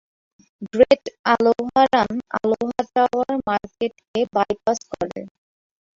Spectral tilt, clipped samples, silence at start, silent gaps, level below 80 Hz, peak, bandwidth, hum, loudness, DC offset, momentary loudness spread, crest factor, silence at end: -5 dB/octave; under 0.1%; 0.6 s; 1.19-1.24 s, 4.08-4.14 s; -56 dBFS; -2 dBFS; 7.6 kHz; none; -21 LUFS; under 0.1%; 12 LU; 20 dB; 0.65 s